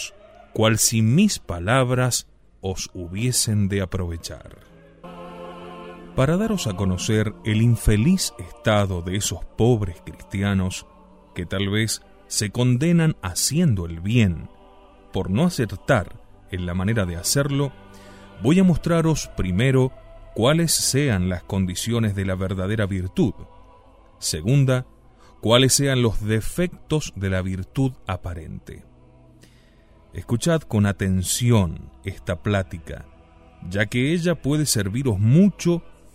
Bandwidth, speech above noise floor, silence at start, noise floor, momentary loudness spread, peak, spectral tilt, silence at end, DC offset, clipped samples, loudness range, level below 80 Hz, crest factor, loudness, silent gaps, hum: 16 kHz; 31 dB; 0 s; -52 dBFS; 16 LU; -4 dBFS; -5 dB/octave; 0.25 s; under 0.1%; under 0.1%; 5 LU; -40 dBFS; 20 dB; -22 LUFS; none; none